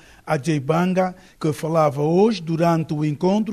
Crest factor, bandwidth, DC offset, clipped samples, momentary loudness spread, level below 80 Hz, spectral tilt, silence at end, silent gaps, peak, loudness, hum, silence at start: 14 dB; 13.5 kHz; under 0.1%; under 0.1%; 8 LU; -56 dBFS; -7 dB/octave; 0 s; none; -6 dBFS; -21 LUFS; none; 0.25 s